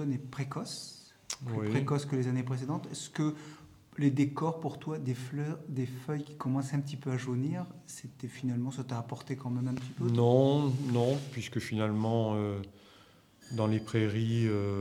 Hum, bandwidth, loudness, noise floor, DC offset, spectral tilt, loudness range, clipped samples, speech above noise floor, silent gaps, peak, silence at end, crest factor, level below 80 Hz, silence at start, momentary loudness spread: none; 13.5 kHz; -33 LUFS; -60 dBFS; under 0.1%; -7 dB/octave; 6 LU; under 0.1%; 28 dB; none; -12 dBFS; 0 s; 20 dB; -74 dBFS; 0 s; 12 LU